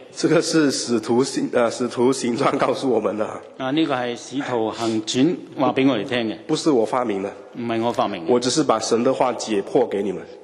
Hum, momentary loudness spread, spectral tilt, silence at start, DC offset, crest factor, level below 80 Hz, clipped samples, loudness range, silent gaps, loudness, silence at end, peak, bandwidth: none; 7 LU; -4.5 dB/octave; 0 s; under 0.1%; 18 dB; -66 dBFS; under 0.1%; 2 LU; none; -21 LUFS; 0.05 s; -4 dBFS; 12.5 kHz